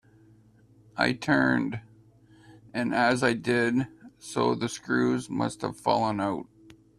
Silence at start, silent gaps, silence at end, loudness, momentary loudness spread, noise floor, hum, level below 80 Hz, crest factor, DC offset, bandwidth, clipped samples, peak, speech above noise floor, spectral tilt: 0.95 s; none; 0.55 s; -27 LUFS; 13 LU; -58 dBFS; none; -62 dBFS; 20 dB; under 0.1%; 12.5 kHz; under 0.1%; -8 dBFS; 32 dB; -5.5 dB/octave